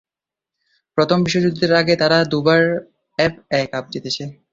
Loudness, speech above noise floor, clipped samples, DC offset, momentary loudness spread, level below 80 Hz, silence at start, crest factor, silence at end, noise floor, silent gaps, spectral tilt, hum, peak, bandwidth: -18 LUFS; 70 dB; under 0.1%; under 0.1%; 11 LU; -54 dBFS; 0.95 s; 16 dB; 0.2 s; -87 dBFS; none; -5.5 dB/octave; none; -2 dBFS; 7.8 kHz